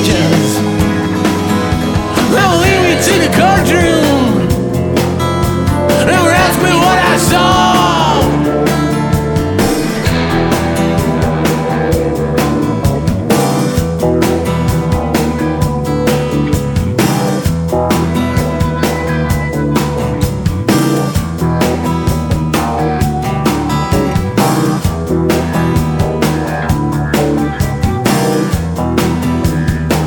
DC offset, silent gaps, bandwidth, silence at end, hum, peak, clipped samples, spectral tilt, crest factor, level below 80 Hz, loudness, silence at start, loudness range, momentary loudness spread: under 0.1%; none; 18 kHz; 0 s; none; 0 dBFS; under 0.1%; -5.5 dB/octave; 12 dB; -26 dBFS; -12 LUFS; 0 s; 4 LU; 6 LU